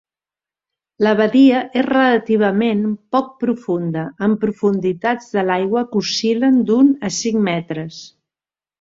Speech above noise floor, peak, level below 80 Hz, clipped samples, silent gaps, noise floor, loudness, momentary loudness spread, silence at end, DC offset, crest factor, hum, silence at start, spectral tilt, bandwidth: over 74 dB; -2 dBFS; -60 dBFS; under 0.1%; none; under -90 dBFS; -17 LUFS; 9 LU; 0.75 s; under 0.1%; 16 dB; none; 1 s; -5.5 dB/octave; 7.8 kHz